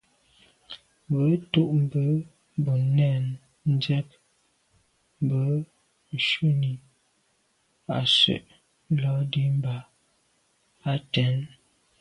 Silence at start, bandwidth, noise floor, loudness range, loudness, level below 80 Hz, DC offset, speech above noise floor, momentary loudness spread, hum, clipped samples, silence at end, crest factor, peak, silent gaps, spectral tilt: 0.7 s; 10.5 kHz; -69 dBFS; 4 LU; -25 LUFS; -64 dBFS; under 0.1%; 45 dB; 16 LU; none; under 0.1%; 0.55 s; 18 dB; -8 dBFS; none; -6.5 dB/octave